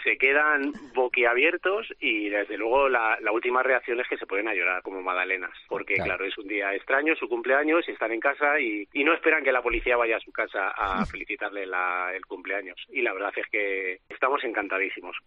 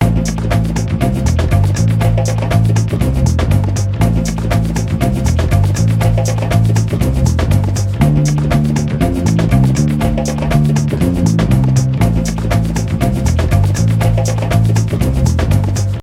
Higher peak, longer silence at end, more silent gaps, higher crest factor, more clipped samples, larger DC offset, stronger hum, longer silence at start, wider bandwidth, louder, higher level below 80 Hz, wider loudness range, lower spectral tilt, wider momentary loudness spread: second, -8 dBFS vs 0 dBFS; about the same, 0.05 s vs 0 s; neither; first, 18 dB vs 12 dB; neither; neither; neither; about the same, 0 s vs 0 s; second, 7.2 kHz vs 15.5 kHz; second, -25 LUFS vs -14 LUFS; second, -52 dBFS vs -22 dBFS; first, 5 LU vs 1 LU; second, -1 dB/octave vs -6.5 dB/octave; first, 8 LU vs 3 LU